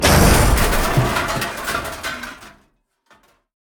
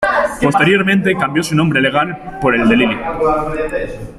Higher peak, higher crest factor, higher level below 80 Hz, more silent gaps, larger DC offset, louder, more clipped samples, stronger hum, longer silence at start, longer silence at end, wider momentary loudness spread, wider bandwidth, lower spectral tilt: about the same, 0 dBFS vs -2 dBFS; about the same, 18 dB vs 14 dB; first, -24 dBFS vs -36 dBFS; neither; neither; second, -18 LUFS vs -14 LUFS; neither; neither; about the same, 0 s vs 0 s; first, 1.15 s vs 0 s; first, 15 LU vs 8 LU; first, over 20 kHz vs 13.5 kHz; second, -4 dB/octave vs -5.5 dB/octave